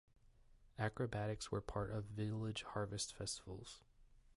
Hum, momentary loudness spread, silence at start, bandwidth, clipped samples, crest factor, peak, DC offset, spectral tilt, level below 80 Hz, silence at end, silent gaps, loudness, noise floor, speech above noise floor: none; 11 LU; 0.25 s; 11.5 kHz; under 0.1%; 18 dB; -26 dBFS; under 0.1%; -4.5 dB/octave; -62 dBFS; 0.2 s; none; -45 LUFS; -67 dBFS; 23 dB